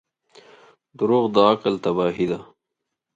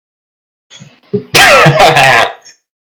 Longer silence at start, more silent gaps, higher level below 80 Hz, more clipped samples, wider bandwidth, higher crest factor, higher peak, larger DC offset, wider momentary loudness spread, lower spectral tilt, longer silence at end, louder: second, 1 s vs 1.15 s; neither; second, -62 dBFS vs -40 dBFS; second, under 0.1% vs 2%; second, 7.8 kHz vs over 20 kHz; first, 20 dB vs 10 dB; about the same, -2 dBFS vs 0 dBFS; neither; second, 9 LU vs 15 LU; first, -7 dB/octave vs -3.5 dB/octave; about the same, 0.7 s vs 0.65 s; second, -21 LUFS vs -5 LUFS